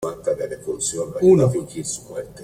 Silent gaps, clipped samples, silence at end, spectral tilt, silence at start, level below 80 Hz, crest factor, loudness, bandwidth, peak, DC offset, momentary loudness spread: none; under 0.1%; 0 s; -6 dB/octave; 0 s; -52 dBFS; 16 dB; -21 LUFS; 15 kHz; -4 dBFS; under 0.1%; 13 LU